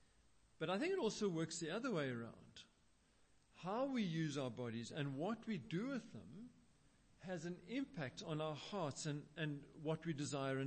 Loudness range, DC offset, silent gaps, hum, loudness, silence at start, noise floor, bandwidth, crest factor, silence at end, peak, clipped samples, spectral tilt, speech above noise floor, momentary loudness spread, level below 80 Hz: 3 LU; under 0.1%; none; none; -45 LUFS; 0.6 s; -74 dBFS; 8.4 kHz; 16 dB; 0 s; -30 dBFS; under 0.1%; -5.5 dB/octave; 30 dB; 14 LU; -76 dBFS